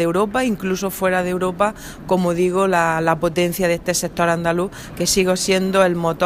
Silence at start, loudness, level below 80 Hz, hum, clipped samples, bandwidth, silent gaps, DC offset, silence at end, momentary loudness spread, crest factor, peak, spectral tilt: 0 s; -19 LUFS; -44 dBFS; none; under 0.1%; 15.5 kHz; none; under 0.1%; 0 s; 5 LU; 16 dB; -2 dBFS; -4.5 dB/octave